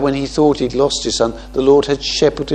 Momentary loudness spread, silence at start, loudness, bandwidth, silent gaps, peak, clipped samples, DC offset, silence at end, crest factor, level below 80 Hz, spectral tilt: 5 LU; 0 s; -15 LUFS; 9.8 kHz; none; 0 dBFS; under 0.1%; under 0.1%; 0 s; 14 dB; -36 dBFS; -4.5 dB/octave